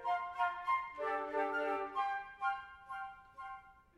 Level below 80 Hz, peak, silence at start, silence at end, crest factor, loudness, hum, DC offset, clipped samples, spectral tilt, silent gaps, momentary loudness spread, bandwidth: -72 dBFS; -22 dBFS; 0 s; 0.15 s; 16 dB; -38 LUFS; none; under 0.1%; under 0.1%; -4 dB/octave; none; 14 LU; 12 kHz